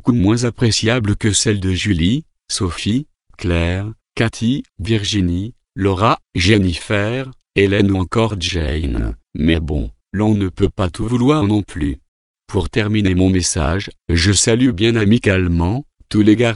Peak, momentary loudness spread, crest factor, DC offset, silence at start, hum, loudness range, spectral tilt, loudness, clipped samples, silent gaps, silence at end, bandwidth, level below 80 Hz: 0 dBFS; 10 LU; 16 dB; under 0.1%; 0.05 s; none; 4 LU; -5 dB/octave; -17 LUFS; under 0.1%; 12.08-12.34 s; 0 s; 11.5 kHz; -30 dBFS